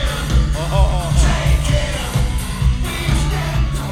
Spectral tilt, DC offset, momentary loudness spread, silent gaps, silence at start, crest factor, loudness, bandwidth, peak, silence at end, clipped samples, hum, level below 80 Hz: -5 dB/octave; under 0.1%; 4 LU; none; 0 s; 14 dB; -18 LUFS; 15 kHz; -2 dBFS; 0 s; under 0.1%; none; -18 dBFS